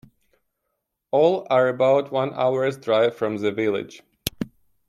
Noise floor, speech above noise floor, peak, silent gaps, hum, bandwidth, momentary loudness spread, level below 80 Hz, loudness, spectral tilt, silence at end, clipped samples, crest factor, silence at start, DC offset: -78 dBFS; 57 dB; 0 dBFS; none; none; 15 kHz; 12 LU; -58 dBFS; -22 LUFS; -5.5 dB/octave; 0.4 s; under 0.1%; 22 dB; 1.15 s; under 0.1%